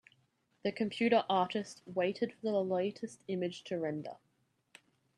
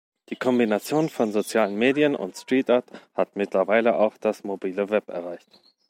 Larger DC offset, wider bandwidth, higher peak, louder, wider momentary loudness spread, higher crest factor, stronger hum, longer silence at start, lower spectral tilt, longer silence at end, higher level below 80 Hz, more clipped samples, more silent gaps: neither; second, 11.5 kHz vs 16.5 kHz; second, -16 dBFS vs -6 dBFS; second, -35 LUFS vs -24 LUFS; about the same, 10 LU vs 12 LU; about the same, 20 dB vs 18 dB; neither; first, 0.65 s vs 0.3 s; about the same, -5.5 dB/octave vs -5.5 dB/octave; first, 1.05 s vs 0.5 s; second, -80 dBFS vs -74 dBFS; neither; neither